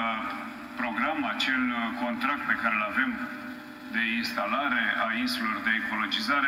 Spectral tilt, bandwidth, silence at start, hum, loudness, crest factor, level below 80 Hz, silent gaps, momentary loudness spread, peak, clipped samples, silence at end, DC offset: -3.5 dB/octave; 16.5 kHz; 0 s; none; -28 LUFS; 18 dB; -64 dBFS; none; 9 LU; -10 dBFS; under 0.1%; 0 s; under 0.1%